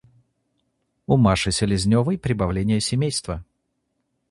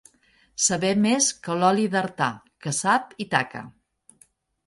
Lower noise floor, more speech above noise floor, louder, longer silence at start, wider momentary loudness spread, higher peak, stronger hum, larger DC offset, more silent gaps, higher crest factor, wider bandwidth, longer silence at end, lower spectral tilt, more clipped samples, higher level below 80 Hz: first, -74 dBFS vs -61 dBFS; first, 54 dB vs 38 dB; about the same, -21 LUFS vs -23 LUFS; first, 1.1 s vs 0.6 s; about the same, 11 LU vs 11 LU; about the same, -4 dBFS vs -4 dBFS; neither; neither; neither; about the same, 20 dB vs 22 dB; about the same, 11.5 kHz vs 11.5 kHz; about the same, 0.9 s vs 0.95 s; first, -5.5 dB/octave vs -3.5 dB/octave; neither; first, -40 dBFS vs -64 dBFS